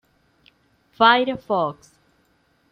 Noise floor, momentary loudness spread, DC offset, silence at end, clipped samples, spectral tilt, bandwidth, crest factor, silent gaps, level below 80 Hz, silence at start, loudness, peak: -63 dBFS; 8 LU; under 0.1%; 1 s; under 0.1%; -5.5 dB/octave; 9.6 kHz; 22 dB; none; -64 dBFS; 1 s; -19 LUFS; -2 dBFS